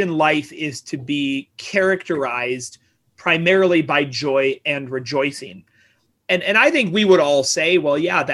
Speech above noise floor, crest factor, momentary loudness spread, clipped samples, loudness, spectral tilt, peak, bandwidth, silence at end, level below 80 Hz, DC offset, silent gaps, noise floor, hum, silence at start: 42 dB; 18 dB; 13 LU; under 0.1%; -18 LUFS; -4 dB/octave; -2 dBFS; 12.5 kHz; 0 s; -64 dBFS; under 0.1%; none; -60 dBFS; none; 0 s